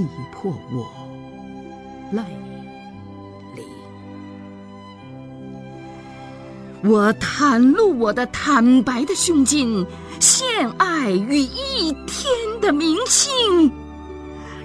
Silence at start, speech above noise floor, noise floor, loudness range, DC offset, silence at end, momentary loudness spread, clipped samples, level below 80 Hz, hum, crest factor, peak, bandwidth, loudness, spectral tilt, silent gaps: 0 s; 21 dB; -39 dBFS; 21 LU; under 0.1%; 0 s; 24 LU; under 0.1%; -46 dBFS; none; 18 dB; -2 dBFS; 11 kHz; -18 LUFS; -3 dB/octave; none